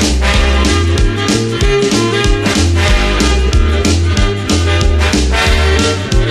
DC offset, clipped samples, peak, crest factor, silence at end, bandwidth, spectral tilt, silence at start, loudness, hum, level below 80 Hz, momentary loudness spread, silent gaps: 0.3%; under 0.1%; 0 dBFS; 10 dB; 0 s; 13.5 kHz; -4.5 dB/octave; 0 s; -12 LUFS; none; -14 dBFS; 2 LU; none